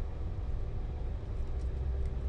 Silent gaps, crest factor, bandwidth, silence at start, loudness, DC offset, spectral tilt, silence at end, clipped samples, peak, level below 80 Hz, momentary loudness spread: none; 10 dB; 6 kHz; 0 s; -39 LUFS; under 0.1%; -8.5 dB/octave; 0 s; under 0.1%; -24 dBFS; -36 dBFS; 3 LU